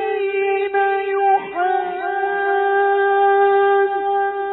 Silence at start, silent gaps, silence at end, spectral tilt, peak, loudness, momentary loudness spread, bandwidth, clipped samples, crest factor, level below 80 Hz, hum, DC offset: 0 s; none; 0 s; -7.5 dB/octave; -6 dBFS; -18 LUFS; 6 LU; 4.1 kHz; under 0.1%; 12 dB; -62 dBFS; none; under 0.1%